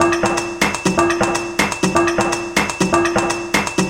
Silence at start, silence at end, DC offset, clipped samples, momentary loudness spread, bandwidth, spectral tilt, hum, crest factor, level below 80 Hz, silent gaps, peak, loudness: 0 s; 0 s; under 0.1%; under 0.1%; 3 LU; 17 kHz; -4 dB/octave; none; 18 dB; -40 dBFS; none; 0 dBFS; -17 LUFS